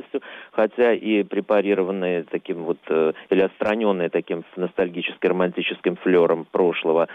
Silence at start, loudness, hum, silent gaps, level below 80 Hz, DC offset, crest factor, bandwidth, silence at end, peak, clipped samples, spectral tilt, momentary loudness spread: 0.15 s; -22 LUFS; none; none; -68 dBFS; under 0.1%; 14 dB; 4.9 kHz; 0 s; -8 dBFS; under 0.1%; -8 dB/octave; 9 LU